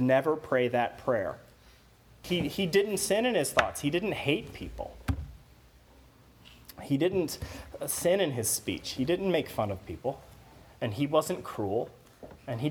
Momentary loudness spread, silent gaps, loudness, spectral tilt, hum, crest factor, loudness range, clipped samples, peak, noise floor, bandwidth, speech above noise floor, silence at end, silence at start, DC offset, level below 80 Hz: 15 LU; none; -30 LUFS; -4.5 dB/octave; none; 24 dB; 6 LU; under 0.1%; -6 dBFS; -58 dBFS; over 20 kHz; 28 dB; 0 s; 0 s; under 0.1%; -50 dBFS